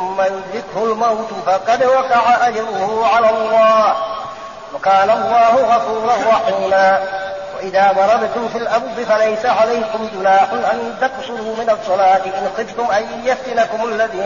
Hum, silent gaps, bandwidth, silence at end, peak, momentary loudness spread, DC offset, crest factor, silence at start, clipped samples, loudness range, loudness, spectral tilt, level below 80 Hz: none; none; 7.2 kHz; 0 s; -2 dBFS; 10 LU; 0.3%; 12 dB; 0 s; under 0.1%; 3 LU; -15 LUFS; -1.5 dB/octave; -54 dBFS